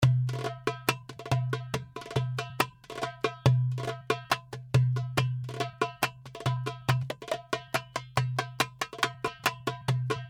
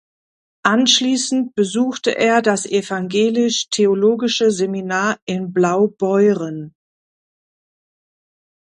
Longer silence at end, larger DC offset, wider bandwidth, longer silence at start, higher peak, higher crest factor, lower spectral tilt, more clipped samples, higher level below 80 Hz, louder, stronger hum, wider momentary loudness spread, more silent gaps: second, 0 s vs 1.95 s; neither; first, 17 kHz vs 11 kHz; second, 0 s vs 0.65 s; second, -8 dBFS vs 0 dBFS; about the same, 22 dB vs 18 dB; about the same, -5 dB/octave vs -4 dB/octave; neither; first, -58 dBFS vs -66 dBFS; second, -31 LUFS vs -17 LUFS; neither; about the same, 8 LU vs 6 LU; second, none vs 5.22-5.27 s